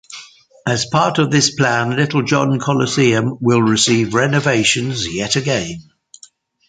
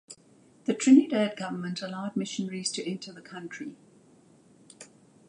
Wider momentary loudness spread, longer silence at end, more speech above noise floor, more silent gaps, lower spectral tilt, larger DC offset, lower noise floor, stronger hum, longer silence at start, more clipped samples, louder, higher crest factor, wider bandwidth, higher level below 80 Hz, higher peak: second, 7 LU vs 29 LU; first, 0.9 s vs 0.45 s; about the same, 32 dB vs 32 dB; neither; about the same, -4.5 dB/octave vs -4.5 dB/octave; neither; second, -48 dBFS vs -59 dBFS; neither; about the same, 0.1 s vs 0.1 s; neither; first, -15 LUFS vs -27 LUFS; second, 16 dB vs 22 dB; second, 9.4 kHz vs 10.5 kHz; first, -50 dBFS vs -80 dBFS; first, 0 dBFS vs -8 dBFS